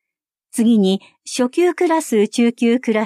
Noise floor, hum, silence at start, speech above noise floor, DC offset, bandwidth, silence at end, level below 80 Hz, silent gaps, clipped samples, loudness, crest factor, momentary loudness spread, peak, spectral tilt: -84 dBFS; none; 0.55 s; 68 dB; under 0.1%; 14.5 kHz; 0 s; -74 dBFS; none; under 0.1%; -17 LUFS; 12 dB; 8 LU; -6 dBFS; -5 dB/octave